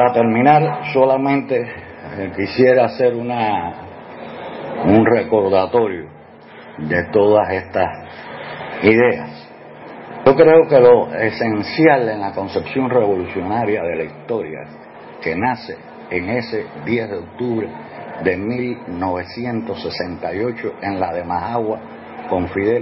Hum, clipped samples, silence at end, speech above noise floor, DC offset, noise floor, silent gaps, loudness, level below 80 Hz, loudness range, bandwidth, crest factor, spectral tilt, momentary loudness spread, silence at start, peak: none; under 0.1%; 0 s; 23 dB; under 0.1%; -40 dBFS; none; -17 LUFS; -52 dBFS; 9 LU; 5.8 kHz; 18 dB; -11 dB/octave; 20 LU; 0 s; 0 dBFS